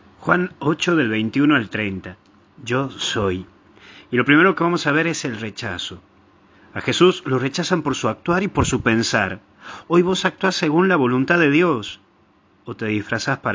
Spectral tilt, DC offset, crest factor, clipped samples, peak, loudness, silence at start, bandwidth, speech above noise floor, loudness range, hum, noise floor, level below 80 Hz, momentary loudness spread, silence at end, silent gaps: -5 dB/octave; under 0.1%; 20 dB; under 0.1%; 0 dBFS; -19 LUFS; 0.2 s; 7.6 kHz; 37 dB; 3 LU; none; -56 dBFS; -46 dBFS; 14 LU; 0 s; none